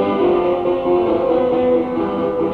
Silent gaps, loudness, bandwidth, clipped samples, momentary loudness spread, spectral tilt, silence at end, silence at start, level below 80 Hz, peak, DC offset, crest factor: none; -17 LUFS; 4.7 kHz; under 0.1%; 4 LU; -9 dB/octave; 0 s; 0 s; -44 dBFS; -4 dBFS; under 0.1%; 12 dB